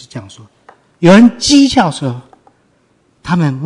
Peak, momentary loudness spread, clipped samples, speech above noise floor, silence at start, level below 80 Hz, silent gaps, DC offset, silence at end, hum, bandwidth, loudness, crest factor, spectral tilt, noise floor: 0 dBFS; 24 LU; 0.5%; 45 dB; 0.15 s; -44 dBFS; none; under 0.1%; 0 s; none; 11 kHz; -10 LUFS; 12 dB; -5 dB/octave; -55 dBFS